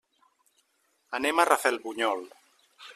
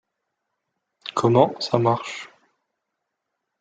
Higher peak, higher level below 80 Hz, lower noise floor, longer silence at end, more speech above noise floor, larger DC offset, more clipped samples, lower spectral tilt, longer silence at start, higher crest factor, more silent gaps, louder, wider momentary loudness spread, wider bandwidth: about the same, -4 dBFS vs -2 dBFS; second, -74 dBFS vs -68 dBFS; second, -72 dBFS vs -80 dBFS; second, 0.05 s vs 1.35 s; second, 45 dB vs 60 dB; neither; neither; second, -1 dB/octave vs -6.5 dB/octave; about the same, 1.1 s vs 1.05 s; about the same, 26 dB vs 24 dB; neither; second, -27 LUFS vs -21 LUFS; first, 20 LU vs 17 LU; first, 14 kHz vs 9.2 kHz